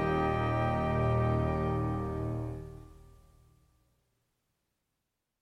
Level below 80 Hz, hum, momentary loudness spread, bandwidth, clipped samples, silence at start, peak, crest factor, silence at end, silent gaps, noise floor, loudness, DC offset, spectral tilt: -44 dBFS; none; 13 LU; 6 kHz; under 0.1%; 0 s; -18 dBFS; 16 dB; 2.4 s; none; -84 dBFS; -31 LUFS; under 0.1%; -9 dB/octave